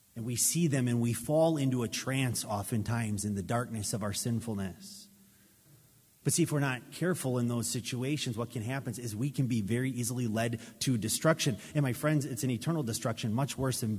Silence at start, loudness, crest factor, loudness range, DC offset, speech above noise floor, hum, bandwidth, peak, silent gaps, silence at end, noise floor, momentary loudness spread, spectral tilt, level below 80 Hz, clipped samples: 0.15 s; -32 LUFS; 20 dB; 4 LU; under 0.1%; 31 dB; none; 16 kHz; -12 dBFS; none; 0 s; -62 dBFS; 8 LU; -5 dB/octave; -60 dBFS; under 0.1%